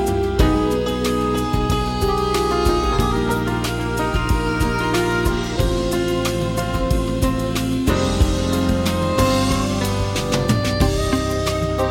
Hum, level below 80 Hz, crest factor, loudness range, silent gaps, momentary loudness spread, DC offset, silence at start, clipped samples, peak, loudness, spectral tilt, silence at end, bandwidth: none; -26 dBFS; 16 dB; 1 LU; none; 3 LU; under 0.1%; 0 s; under 0.1%; -4 dBFS; -20 LUFS; -5.5 dB/octave; 0 s; 16.5 kHz